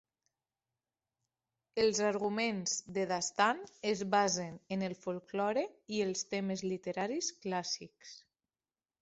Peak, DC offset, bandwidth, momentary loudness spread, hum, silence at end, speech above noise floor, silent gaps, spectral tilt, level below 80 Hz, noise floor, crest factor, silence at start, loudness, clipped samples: -16 dBFS; under 0.1%; 8 kHz; 9 LU; none; 0.85 s; over 55 dB; none; -3.5 dB/octave; -76 dBFS; under -90 dBFS; 22 dB; 1.75 s; -35 LUFS; under 0.1%